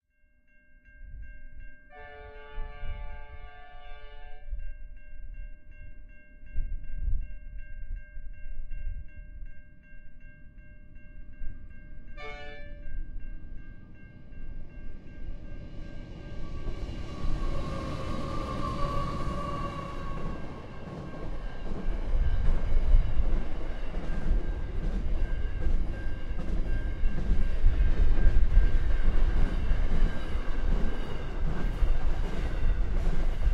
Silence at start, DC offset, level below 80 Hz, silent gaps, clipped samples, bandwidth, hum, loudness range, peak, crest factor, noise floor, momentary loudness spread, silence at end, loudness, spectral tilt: 1 s; under 0.1%; -28 dBFS; none; under 0.1%; 5.2 kHz; none; 17 LU; -8 dBFS; 18 dB; -63 dBFS; 20 LU; 0 s; -35 LUFS; -7.5 dB/octave